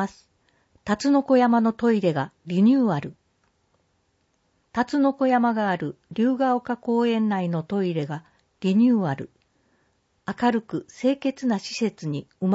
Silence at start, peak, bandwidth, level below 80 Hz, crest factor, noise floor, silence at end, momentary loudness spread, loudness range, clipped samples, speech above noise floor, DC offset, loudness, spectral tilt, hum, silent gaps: 0 s; -8 dBFS; 8 kHz; -64 dBFS; 16 dB; -69 dBFS; 0 s; 13 LU; 4 LU; under 0.1%; 47 dB; under 0.1%; -23 LUFS; -7 dB/octave; none; none